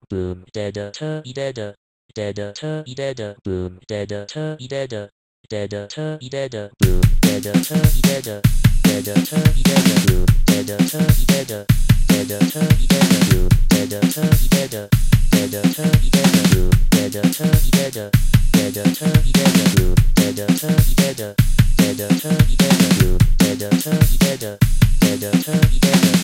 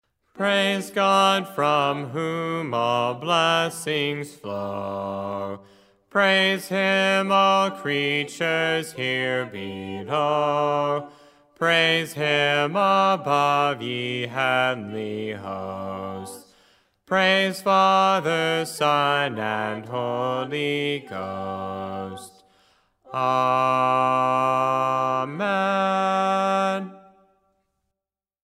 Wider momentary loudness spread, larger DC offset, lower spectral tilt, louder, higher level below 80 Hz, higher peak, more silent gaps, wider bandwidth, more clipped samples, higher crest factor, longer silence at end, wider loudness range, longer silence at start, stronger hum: about the same, 13 LU vs 13 LU; neither; about the same, -5.5 dB/octave vs -4.5 dB/octave; first, -17 LUFS vs -22 LUFS; first, -20 dBFS vs -72 dBFS; first, 0 dBFS vs -4 dBFS; first, 1.77-2.09 s, 5.12-5.44 s vs none; about the same, 17 kHz vs 16 kHz; neither; about the same, 16 dB vs 18 dB; second, 0 s vs 1.45 s; first, 11 LU vs 5 LU; second, 0.1 s vs 0.35 s; neither